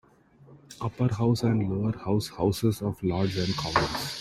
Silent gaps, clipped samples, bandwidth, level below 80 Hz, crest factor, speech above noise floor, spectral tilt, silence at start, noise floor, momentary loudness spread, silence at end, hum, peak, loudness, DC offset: none; under 0.1%; 14.5 kHz; -52 dBFS; 20 dB; 29 dB; -6 dB/octave; 0.5 s; -56 dBFS; 5 LU; 0 s; none; -8 dBFS; -27 LUFS; under 0.1%